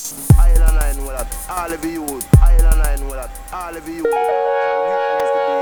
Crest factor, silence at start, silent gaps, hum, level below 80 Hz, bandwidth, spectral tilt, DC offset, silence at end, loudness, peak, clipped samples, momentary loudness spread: 14 dB; 0 s; none; none; -16 dBFS; over 20 kHz; -6 dB/octave; under 0.1%; 0 s; -18 LUFS; 0 dBFS; 0.2%; 15 LU